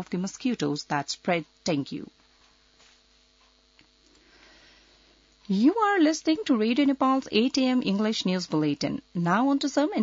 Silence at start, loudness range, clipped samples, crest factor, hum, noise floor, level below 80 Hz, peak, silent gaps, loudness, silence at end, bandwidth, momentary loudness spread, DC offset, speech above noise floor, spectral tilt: 0 s; 11 LU; under 0.1%; 18 dB; none; -62 dBFS; -66 dBFS; -10 dBFS; none; -25 LUFS; 0 s; 7.8 kHz; 8 LU; under 0.1%; 37 dB; -5 dB/octave